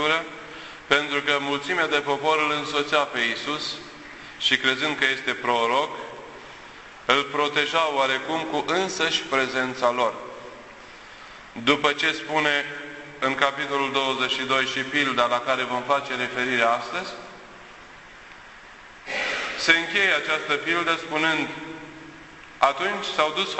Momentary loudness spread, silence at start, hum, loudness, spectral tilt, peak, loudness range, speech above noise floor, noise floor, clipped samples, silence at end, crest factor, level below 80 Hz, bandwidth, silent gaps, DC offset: 21 LU; 0 s; none; -23 LUFS; -2.5 dB/octave; -2 dBFS; 3 LU; 22 dB; -45 dBFS; under 0.1%; 0 s; 22 dB; -60 dBFS; 8.4 kHz; none; under 0.1%